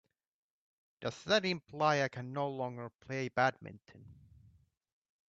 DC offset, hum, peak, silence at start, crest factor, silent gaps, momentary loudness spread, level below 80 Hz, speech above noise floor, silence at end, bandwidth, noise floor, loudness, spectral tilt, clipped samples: under 0.1%; none; -16 dBFS; 1 s; 22 dB; 2.95-2.99 s; 12 LU; -74 dBFS; 31 dB; 1.15 s; 7.8 kHz; -67 dBFS; -35 LUFS; -5 dB/octave; under 0.1%